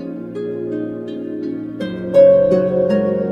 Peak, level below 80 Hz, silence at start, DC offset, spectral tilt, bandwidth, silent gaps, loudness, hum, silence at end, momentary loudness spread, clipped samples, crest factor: 0 dBFS; -54 dBFS; 0 s; under 0.1%; -9 dB/octave; 5.6 kHz; none; -17 LUFS; none; 0 s; 16 LU; under 0.1%; 16 dB